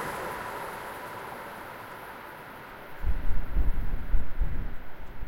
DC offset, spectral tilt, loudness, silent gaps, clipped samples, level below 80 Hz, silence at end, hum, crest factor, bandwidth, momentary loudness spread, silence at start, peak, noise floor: under 0.1%; -5.5 dB/octave; -37 LUFS; none; under 0.1%; -32 dBFS; 0 s; none; 16 dB; 16 kHz; 10 LU; 0 s; -10 dBFS; -44 dBFS